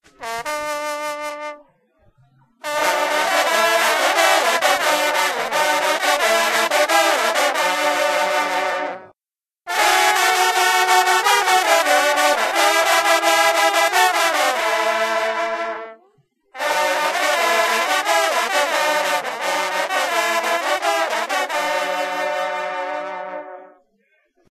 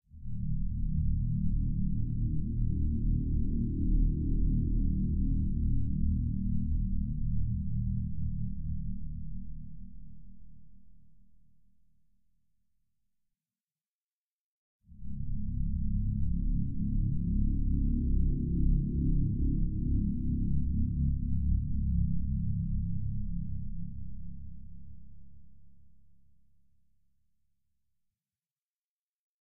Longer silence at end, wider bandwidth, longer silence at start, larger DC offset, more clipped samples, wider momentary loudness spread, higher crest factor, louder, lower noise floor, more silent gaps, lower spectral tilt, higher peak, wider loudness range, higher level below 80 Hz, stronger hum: first, 0.85 s vs 0.15 s; first, 14 kHz vs 0.5 kHz; first, 0.2 s vs 0 s; neither; neither; about the same, 11 LU vs 13 LU; about the same, 20 dB vs 16 dB; first, -17 LUFS vs -33 LUFS; about the same, under -90 dBFS vs under -90 dBFS; second, none vs 13.64-13.68 s, 13.87-14.79 s, 28.51-28.99 s; second, 0.5 dB/octave vs -16.5 dB/octave; first, 0 dBFS vs -16 dBFS; second, 6 LU vs 14 LU; second, -68 dBFS vs -34 dBFS; neither